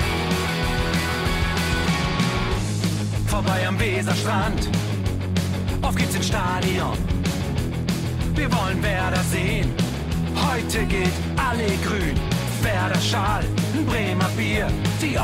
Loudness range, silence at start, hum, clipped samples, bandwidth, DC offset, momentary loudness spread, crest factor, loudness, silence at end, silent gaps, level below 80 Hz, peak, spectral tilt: 1 LU; 0 s; none; under 0.1%; 16 kHz; under 0.1%; 3 LU; 12 dB; -23 LUFS; 0 s; none; -32 dBFS; -10 dBFS; -5 dB/octave